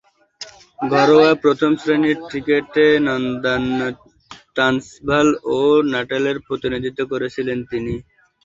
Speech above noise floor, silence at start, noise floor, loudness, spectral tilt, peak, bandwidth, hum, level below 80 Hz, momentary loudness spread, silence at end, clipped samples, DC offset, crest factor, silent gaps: 23 dB; 0.4 s; -40 dBFS; -18 LUFS; -5.5 dB/octave; 0 dBFS; 7.8 kHz; none; -50 dBFS; 13 LU; 0.45 s; under 0.1%; under 0.1%; 18 dB; none